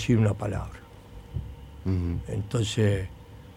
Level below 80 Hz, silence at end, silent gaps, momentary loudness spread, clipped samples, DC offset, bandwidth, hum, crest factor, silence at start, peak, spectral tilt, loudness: -44 dBFS; 0 s; none; 22 LU; under 0.1%; under 0.1%; 12 kHz; none; 18 dB; 0 s; -10 dBFS; -6.5 dB/octave; -29 LUFS